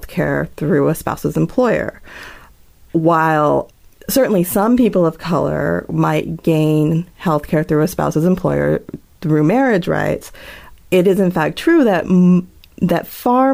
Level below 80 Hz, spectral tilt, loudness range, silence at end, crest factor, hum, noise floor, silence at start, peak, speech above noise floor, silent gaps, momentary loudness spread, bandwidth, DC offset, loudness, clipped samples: -42 dBFS; -7 dB/octave; 2 LU; 0 s; 12 dB; none; -45 dBFS; 0 s; -4 dBFS; 30 dB; none; 10 LU; 16.5 kHz; under 0.1%; -16 LUFS; under 0.1%